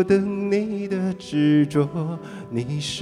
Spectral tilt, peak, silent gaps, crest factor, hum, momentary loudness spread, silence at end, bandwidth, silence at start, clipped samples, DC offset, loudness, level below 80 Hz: -6.5 dB/octave; -6 dBFS; none; 16 dB; none; 11 LU; 0 s; 11.5 kHz; 0 s; under 0.1%; under 0.1%; -23 LUFS; -56 dBFS